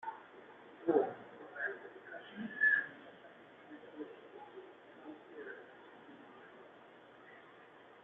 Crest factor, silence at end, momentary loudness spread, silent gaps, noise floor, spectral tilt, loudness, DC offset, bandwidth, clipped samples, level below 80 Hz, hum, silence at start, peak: 24 dB; 0 s; 24 LU; none; -59 dBFS; -3 dB/octave; -38 LUFS; under 0.1%; 4.1 kHz; under 0.1%; -88 dBFS; none; 0 s; -18 dBFS